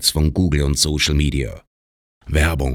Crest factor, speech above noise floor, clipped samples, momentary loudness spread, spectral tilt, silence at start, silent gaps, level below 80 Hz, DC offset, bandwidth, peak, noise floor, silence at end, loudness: 18 dB; over 72 dB; under 0.1%; 7 LU; -4 dB/octave; 0 s; 1.67-2.21 s; -24 dBFS; under 0.1%; 17 kHz; -2 dBFS; under -90 dBFS; 0 s; -18 LUFS